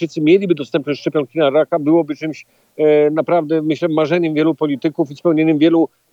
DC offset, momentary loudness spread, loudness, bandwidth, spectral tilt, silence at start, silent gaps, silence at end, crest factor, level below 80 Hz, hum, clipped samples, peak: under 0.1%; 7 LU; -16 LUFS; 7.2 kHz; -7.5 dB/octave; 0 s; none; 0.25 s; 14 dB; -76 dBFS; none; under 0.1%; -2 dBFS